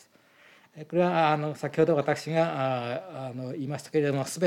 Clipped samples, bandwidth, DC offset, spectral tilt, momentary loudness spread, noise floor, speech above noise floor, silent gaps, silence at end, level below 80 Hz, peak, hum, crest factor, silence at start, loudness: under 0.1%; 16.5 kHz; under 0.1%; -6 dB/octave; 12 LU; -58 dBFS; 31 dB; none; 0 s; -80 dBFS; -10 dBFS; none; 18 dB; 0.75 s; -28 LUFS